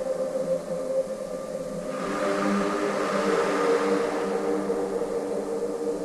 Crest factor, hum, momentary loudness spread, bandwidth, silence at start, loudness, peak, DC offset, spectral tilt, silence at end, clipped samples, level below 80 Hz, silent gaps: 14 dB; none; 8 LU; 13.5 kHz; 0 s; -27 LUFS; -12 dBFS; under 0.1%; -5 dB/octave; 0 s; under 0.1%; -58 dBFS; none